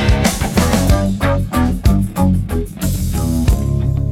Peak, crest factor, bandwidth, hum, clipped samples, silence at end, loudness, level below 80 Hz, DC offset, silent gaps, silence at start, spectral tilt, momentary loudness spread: 0 dBFS; 14 dB; 17 kHz; none; under 0.1%; 0 s; -16 LUFS; -20 dBFS; under 0.1%; none; 0 s; -6 dB/octave; 5 LU